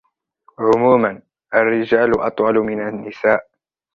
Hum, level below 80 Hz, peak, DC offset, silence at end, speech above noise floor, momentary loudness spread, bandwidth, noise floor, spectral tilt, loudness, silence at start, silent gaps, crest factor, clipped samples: none; -52 dBFS; -2 dBFS; under 0.1%; 0.55 s; 41 dB; 8 LU; 7.2 kHz; -57 dBFS; -7.5 dB/octave; -17 LUFS; 0.6 s; none; 16 dB; under 0.1%